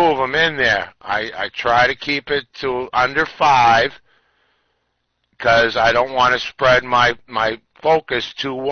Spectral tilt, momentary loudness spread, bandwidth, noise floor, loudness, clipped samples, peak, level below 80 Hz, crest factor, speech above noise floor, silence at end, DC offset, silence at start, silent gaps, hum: -4 dB/octave; 9 LU; 6.6 kHz; -70 dBFS; -17 LUFS; under 0.1%; -4 dBFS; -46 dBFS; 14 dB; 53 dB; 0 s; under 0.1%; 0 s; none; none